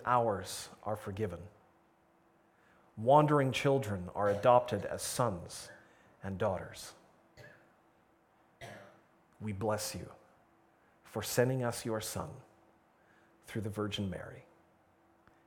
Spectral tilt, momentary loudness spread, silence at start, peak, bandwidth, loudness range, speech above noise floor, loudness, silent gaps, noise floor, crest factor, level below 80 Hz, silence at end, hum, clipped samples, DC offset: -5 dB/octave; 23 LU; 0 s; -12 dBFS; 19 kHz; 13 LU; 35 dB; -34 LUFS; none; -68 dBFS; 24 dB; -68 dBFS; 1.05 s; none; under 0.1%; under 0.1%